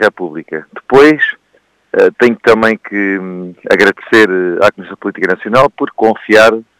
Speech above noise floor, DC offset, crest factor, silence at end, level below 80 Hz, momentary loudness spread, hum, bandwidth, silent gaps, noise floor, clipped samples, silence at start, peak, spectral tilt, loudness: 44 dB; under 0.1%; 12 dB; 0.2 s; -48 dBFS; 15 LU; none; 15.5 kHz; none; -54 dBFS; 1%; 0 s; 0 dBFS; -5 dB/octave; -10 LUFS